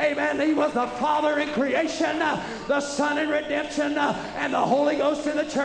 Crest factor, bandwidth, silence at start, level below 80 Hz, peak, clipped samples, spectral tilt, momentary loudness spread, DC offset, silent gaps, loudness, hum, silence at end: 14 dB; 10 kHz; 0 s; -56 dBFS; -10 dBFS; under 0.1%; -4 dB/octave; 4 LU; under 0.1%; none; -24 LUFS; none; 0 s